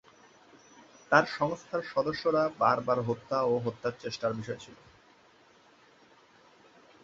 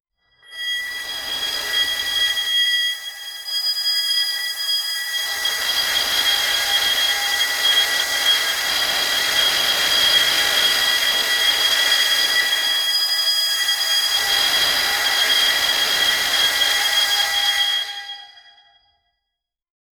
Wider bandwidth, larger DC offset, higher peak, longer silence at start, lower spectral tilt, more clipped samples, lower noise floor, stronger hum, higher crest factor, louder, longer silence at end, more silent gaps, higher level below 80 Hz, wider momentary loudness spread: second, 7.8 kHz vs over 20 kHz; neither; about the same, -6 dBFS vs -4 dBFS; first, 1.1 s vs 0.5 s; first, -5.5 dB/octave vs 2 dB/octave; neither; second, -61 dBFS vs -82 dBFS; neither; first, 26 dB vs 16 dB; second, -30 LUFS vs -16 LUFS; first, 2.3 s vs 1.7 s; neither; second, -68 dBFS vs -56 dBFS; first, 11 LU vs 7 LU